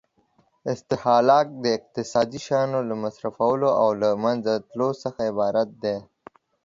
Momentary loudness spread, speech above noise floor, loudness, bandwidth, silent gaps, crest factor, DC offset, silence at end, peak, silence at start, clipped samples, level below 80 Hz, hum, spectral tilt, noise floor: 10 LU; 42 dB; -23 LUFS; 7.6 kHz; none; 20 dB; under 0.1%; 0.65 s; -4 dBFS; 0.65 s; under 0.1%; -64 dBFS; none; -6 dB/octave; -65 dBFS